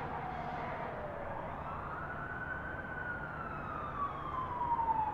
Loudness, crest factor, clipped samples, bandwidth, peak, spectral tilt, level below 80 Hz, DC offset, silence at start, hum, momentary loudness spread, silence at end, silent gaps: -39 LUFS; 18 dB; under 0.1%; 8.2 kHz; -22 dBFS; -7.5 dB/octave; -54 dBFS; under 0.1%; 0 s; none; 7 LU; 0 s; none